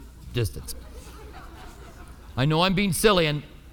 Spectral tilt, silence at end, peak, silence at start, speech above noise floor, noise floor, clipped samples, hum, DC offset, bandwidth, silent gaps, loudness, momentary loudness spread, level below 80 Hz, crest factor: -5 dB/octave; 0 s; -6 dBFS; 0 s; 20 dB; -43 dBFS; under 0.1%; none; under 0.1%; 19.5 kHz; none; -23 LUFS; 25 LU; -42 dBFS; 20 dB